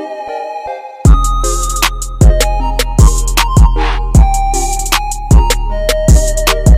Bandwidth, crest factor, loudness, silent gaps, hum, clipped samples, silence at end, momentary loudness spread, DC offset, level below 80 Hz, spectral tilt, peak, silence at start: 16 kHz; 10 dB; -12 LUFS; none; none; 0.3%; 0 s; 10 LU; under 0.1%; -12 dBFS; -4.5 dB/octave; 0 dBFS; 0 s